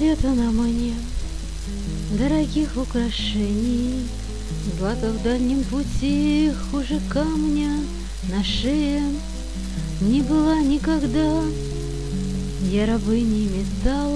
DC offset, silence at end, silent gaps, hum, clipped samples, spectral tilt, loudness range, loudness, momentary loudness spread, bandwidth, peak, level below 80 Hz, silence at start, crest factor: 1%; 0 s; none; none; under 0.1%; -6 dB/octave; 2 LU; -23 LUFS; 10 LU; 11 kHz; -6 dBFS; -30 dBFS; 0 s; 16 dB